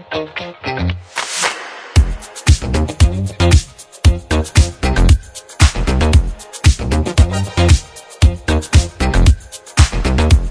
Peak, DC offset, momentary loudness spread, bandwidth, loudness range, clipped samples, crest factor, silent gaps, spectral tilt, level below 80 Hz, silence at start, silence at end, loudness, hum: 0 dBFS; under 0.1%; 9 LU; 11 kHz; 2 LU; under 0.1%; 14 dB; none; -5 dB/octave; -16 dBFS; 0.1 s; 0 s; -15 LUFS; none